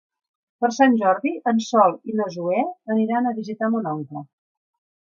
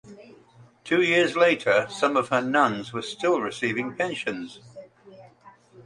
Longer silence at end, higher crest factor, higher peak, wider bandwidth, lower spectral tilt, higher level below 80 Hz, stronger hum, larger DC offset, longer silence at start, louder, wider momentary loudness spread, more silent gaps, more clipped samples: first, 0.9 s vs 0.05 s; about the same, 20 dB vs 20 dB; first, -2 dBFS vs -6 dBFS; second, 7.4 kHz vs 11 kHz; first, -6 dB/octave vs -4.5 dB/octave; second, -76 dBFS vs -68 dBFS; neither; neither; first, 0.6 s vs 0.05 s; about the same, -21 LUFS vs -23 LUFS; second, 9 LU vs 12 LU; neither; neither